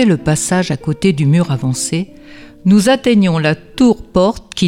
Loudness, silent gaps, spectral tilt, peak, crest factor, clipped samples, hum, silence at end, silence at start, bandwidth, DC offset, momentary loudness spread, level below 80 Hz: -14 LUFS; none; -5.5 dB/octave; -2 dBFS; 12 dB; under 0.1%; none; 0 s; 0 s; 15.5 kHz; under 0.1%; 7 LU; -40 dBFS